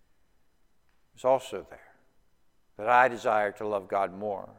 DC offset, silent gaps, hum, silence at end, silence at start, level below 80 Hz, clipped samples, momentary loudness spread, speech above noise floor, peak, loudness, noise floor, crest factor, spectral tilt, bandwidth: under 0.1%; none; none; 0.15 s; 1.2 s; -70 dBFS; under 0.1%; 13 LU; 42 dB; -6 dBFS; -27 LUFS; -70 dBFS; 24 dB; -4.5 dB/octave; 16 kHz